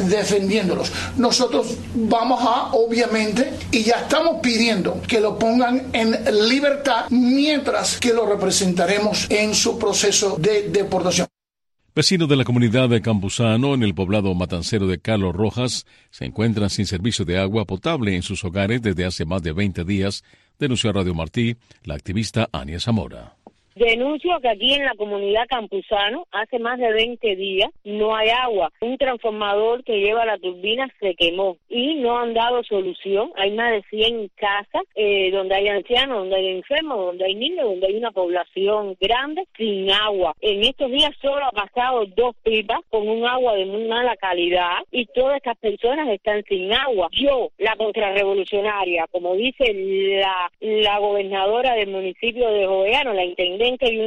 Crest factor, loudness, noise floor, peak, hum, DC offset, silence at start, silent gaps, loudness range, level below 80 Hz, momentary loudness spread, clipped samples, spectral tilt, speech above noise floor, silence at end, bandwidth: 16 dB; -20 LUFS; -78 dBFS; -4 dBFS; none; under 0.1%; 0 s; none; 4 LU; -46 dBFS; 6 LU; under 0.1%; -4 dB/octave; 58 dB; 0 s; 12.5 kHz